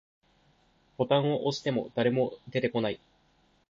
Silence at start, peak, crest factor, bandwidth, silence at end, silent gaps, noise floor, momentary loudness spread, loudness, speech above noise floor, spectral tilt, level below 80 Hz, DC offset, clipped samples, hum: 1 s; -10 dBFS; 20 dB; 7.6 kHz; 0.75 s; none; -67 dBFS; 8 LU; -29 LUFS; 38 dB; -6.5 dB/octave; -68 dBFS; under 0.1%; under 0.1%; none